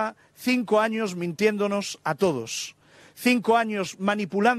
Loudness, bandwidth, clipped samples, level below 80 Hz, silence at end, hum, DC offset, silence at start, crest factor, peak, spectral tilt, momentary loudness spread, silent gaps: -25 LUFS; 14.5 kHz; under 0.1%; -70 dBFS; 0 s; none; under 0.1%; 0 s; 16 dB; -8 dBFS; -4.5 dB/octave; 9 LU; none